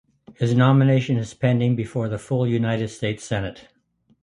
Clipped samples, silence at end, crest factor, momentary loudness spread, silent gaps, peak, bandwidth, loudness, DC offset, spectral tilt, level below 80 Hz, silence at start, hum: under 0.1%; 0.65 s; 18 dB; 11 LU; none; -4 dBFS; 11 kHz; -22 LUFS; under 0.1%; -7.5 dB/octave; -52 dBFS; 0.3 s; none